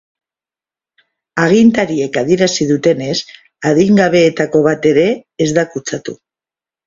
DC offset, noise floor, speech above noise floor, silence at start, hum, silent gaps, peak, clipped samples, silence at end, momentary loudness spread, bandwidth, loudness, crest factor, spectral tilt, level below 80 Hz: under 0.1%; under -90 dBFS; over 78 dB; 1.35 s; none; none; 0 dBFS; under 0.1%; 0.7 s; 12 LU; 7.6 kHz; -13 LUFS; 14 dB; -5.5 dB/octave; -52 dBFS